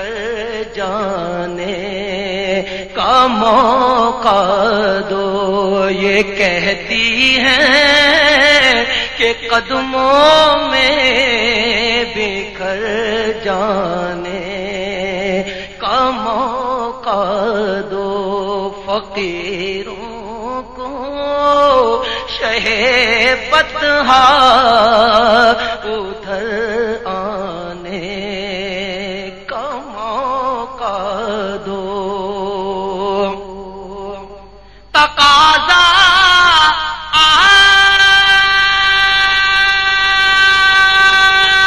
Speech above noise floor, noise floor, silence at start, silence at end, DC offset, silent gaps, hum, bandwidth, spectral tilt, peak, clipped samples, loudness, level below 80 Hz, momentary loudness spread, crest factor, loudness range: 27 dB; -39 dBFS; 0 s; 0 s; 0.6%; none; none; 14 kHz; -2.5 dB/octave; 0 dBFS; under 0.1%; -12 LUFS; -38 dBFS; 15 LU; 14 dB; 13 LU